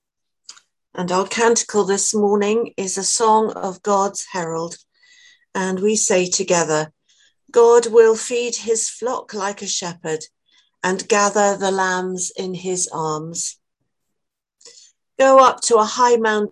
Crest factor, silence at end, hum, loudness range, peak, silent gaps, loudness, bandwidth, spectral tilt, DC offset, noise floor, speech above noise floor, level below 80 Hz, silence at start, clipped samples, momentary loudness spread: 20 dB; 0 s; none; 5 LU; 0 dBFS; none; -18 LUFS; 12 kHz; -3 dB/octave; under 0.1%; -79 dBFS; 62 dB; -68 dBFS; 0.95 s; under 0.1%; 13 LU